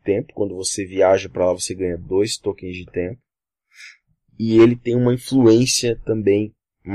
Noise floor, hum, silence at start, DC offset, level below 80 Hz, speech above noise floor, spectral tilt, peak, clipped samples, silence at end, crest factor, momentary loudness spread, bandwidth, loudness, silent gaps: -69 dBFS; none; 0.05 s; under 0.1%; -48 dBFS; 51 dB; -5 dB/octave; -4 dBFS; under 0.1%; 0 s; 16 dB; 13 LU; 13 kHz; -19 LUFS; none